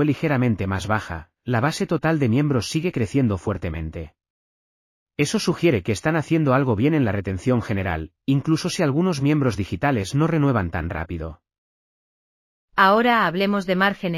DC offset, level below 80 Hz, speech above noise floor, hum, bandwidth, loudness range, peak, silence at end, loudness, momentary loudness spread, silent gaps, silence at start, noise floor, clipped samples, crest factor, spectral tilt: under 0.1%; -44 dBFS; over 69 dB; none; 15.5 kHz; 3 LU; -4 dBFS; 0 s; -21 LUFS; 10 LU; 4.30-5.06 s, 11.58-12.68 s; 0 s; under -90 dBFS; under 0.1%; 18 dB; -6.5 dB/octave